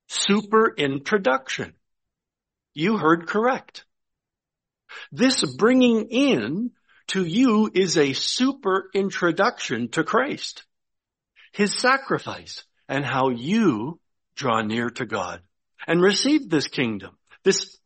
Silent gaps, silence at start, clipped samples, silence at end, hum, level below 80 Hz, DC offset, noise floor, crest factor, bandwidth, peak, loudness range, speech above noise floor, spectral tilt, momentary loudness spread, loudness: none; 0.1 s; under 0.1%; 0.15 s; none; -66 dBFS; under 0.1%; -87 dBFS; 18 dB; 8.8 kHz; -6 dBFS; 4 LU; 65 dB; -4 dB/octave; 15 LU; -22 LUFS